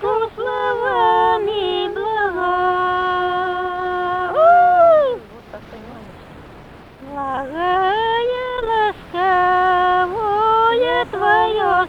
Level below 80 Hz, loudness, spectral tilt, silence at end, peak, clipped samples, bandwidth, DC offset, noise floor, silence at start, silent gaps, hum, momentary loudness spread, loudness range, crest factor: -46 dBFS; -17 LUFS; -5.5 dB/octave; 0 s; -2 dBFS; under 0.1%; 6.8 kHz; under 0.1%; -40 dBFS; 0 s; none; none; 13 LU; 6 LU; 16 dB